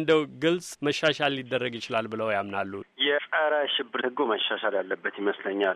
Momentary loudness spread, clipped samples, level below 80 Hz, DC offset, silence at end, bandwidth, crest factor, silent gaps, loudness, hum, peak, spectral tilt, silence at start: 6 LU; under 0.1%; -72 dBFS; under 0.1%; 0 s; 13 kHz; 18 dB; none; -27 LUFS; none; -8 dBFS; -4 dB/octave; 0 s